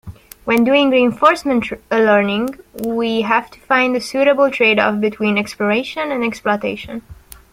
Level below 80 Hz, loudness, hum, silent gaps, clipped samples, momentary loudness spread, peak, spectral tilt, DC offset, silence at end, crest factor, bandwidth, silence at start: -50 dBFS; -16 LUFS; none; none; under 0.1%; 10 LU; 0 dBFS; -5 dB/octave; under 0.1%; 0.4 s; 16 dB; 16.5 kHz; 0.05 s